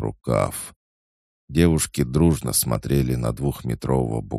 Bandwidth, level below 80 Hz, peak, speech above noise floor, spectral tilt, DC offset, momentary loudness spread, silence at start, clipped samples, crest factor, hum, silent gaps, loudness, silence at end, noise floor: 15.5 kHz; -36 dBFS; -4 dBFS; over 68 dB; -5.5 dB/octave; under 0.1%; 8 LU; 0 s; under 0.1%; 18 dB; none; 0.76-1.48 s; -22 LUFS; 0 s; under -90 dBFS